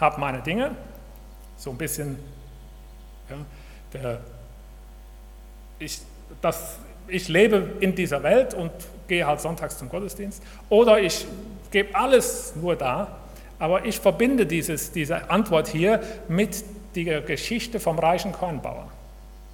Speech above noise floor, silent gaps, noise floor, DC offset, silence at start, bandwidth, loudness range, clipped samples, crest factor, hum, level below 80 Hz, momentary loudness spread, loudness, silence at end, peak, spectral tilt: 19 dB; none; -43 dBFS; under 0.1%; 0 s; 18 kHz; 14 LU; under 0.1%; 22 dB; none; -44 dBFS; 20 LU; -24 LUFS; 0 s; -4 dBFS; -4.5 dB/octave